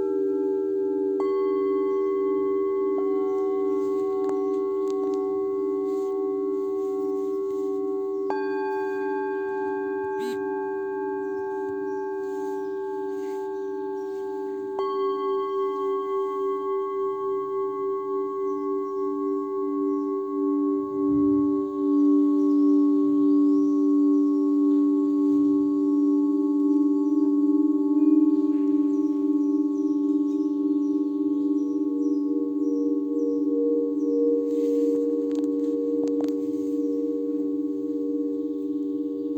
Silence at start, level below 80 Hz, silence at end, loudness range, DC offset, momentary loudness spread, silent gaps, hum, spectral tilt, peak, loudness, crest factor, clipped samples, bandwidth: 0 s; -70 dBFS; 0 s; 8 LU; under 0.1%; 8 LU; none; none; -7.5 dB/octave; -10 dBFS; -25 LUFS; 14 dB; under 0.1%; 6.6 kHz